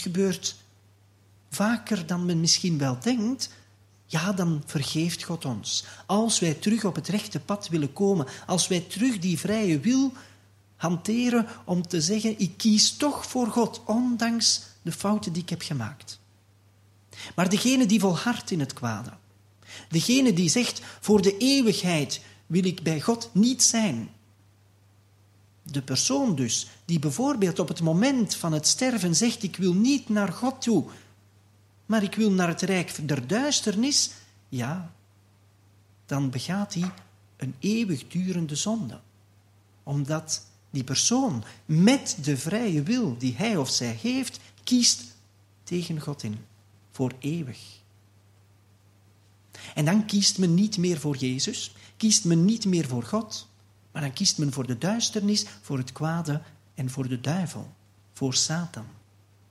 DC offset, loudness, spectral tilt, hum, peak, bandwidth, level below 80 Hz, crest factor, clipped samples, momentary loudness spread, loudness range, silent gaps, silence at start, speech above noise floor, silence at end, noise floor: under 0.1%; -25 LUFS; -4 dB/octave; none; -6 dBFS; 14.5 kHz; -68 dBFS; 20 dB; under 0.1%; 13 LU; 6 LU; none; 0 s; 34 dB; 0.6 s; -59 dBFS